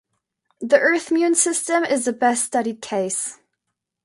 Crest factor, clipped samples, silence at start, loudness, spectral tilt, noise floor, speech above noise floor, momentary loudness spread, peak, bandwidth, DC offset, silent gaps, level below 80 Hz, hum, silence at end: 20 dB; under 0.1%; 0.6 s; -20 LUFS; -2.5 dB/octave; -80 dBFS; 60 dB; 9 LU; -2 dBFS; 11.5 kHz; under 0.1%; none; -72 dBFS; none; 0.7 s